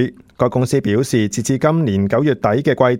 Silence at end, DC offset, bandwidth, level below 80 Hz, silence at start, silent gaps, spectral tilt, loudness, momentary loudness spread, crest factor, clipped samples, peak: 0 s; under 0.1%; 16.5 kHz; -50 dBFS; 0 s; none; -6.5 dB/octave; -17 LUFS; 3 LU; 16 dB; under 0.1%; 0 dBFS